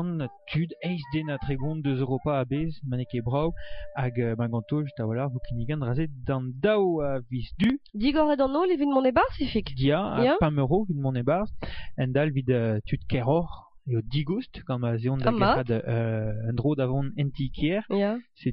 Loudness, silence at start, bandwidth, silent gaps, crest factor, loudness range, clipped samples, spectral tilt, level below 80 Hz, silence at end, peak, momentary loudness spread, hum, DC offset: -27 LUFS; 0 s; 5.6 kHz; none; 18 dB; 5 LU; under 0.1%; -6.5 dB/octave; -44 dBFS; 0 s; -8 dBFS; 8 LU; none; under 0.1%